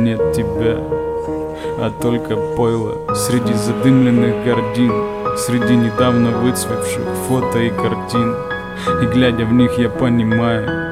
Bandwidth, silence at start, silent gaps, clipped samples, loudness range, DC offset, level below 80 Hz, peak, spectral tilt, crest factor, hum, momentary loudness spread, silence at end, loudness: 15.5 kHz; 0 s; none; under 0.1%; 4 LU; 0.3%; -40 dBFS; 0 dBFS; -6 dB/octave; 14 dB; none; 7 LU; 0 s; -16 LUFS